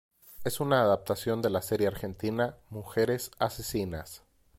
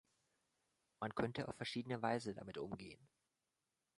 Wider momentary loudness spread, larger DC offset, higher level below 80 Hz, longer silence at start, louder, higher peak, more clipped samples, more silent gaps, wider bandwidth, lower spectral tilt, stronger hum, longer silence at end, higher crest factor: about the same, 12 LU vs 11 LU; neither; first, -56 dBFS vs -74 dBFS; second, 0.25 s vs 1 s; first, -30 LUFS vs -45 LUFS; first, -10 dBFS vs -24 dBFS; neither; neither; first, 16.5 kHz vs 11.5 kHz; about the same, -5.5 dB/octave vs -6 dB/octave; neither; second, 0.4 s vs 0.95 s; about the same, 20 dB vs 24 dB